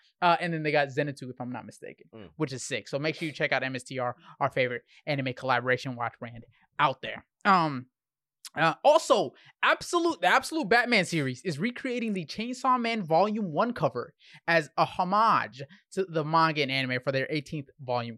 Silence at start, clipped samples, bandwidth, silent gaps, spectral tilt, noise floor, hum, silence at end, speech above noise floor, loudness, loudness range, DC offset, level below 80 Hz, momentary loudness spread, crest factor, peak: 0.2 s; under 0.1%; 13 kHz; none; -5 dB/octave; under -90 dBFS; none; 0 s; over 62 dB; -27 LUFS; 6 LU; under 0.1%; -70 dBFS; 15 LU; 20 dB; -10 dBFS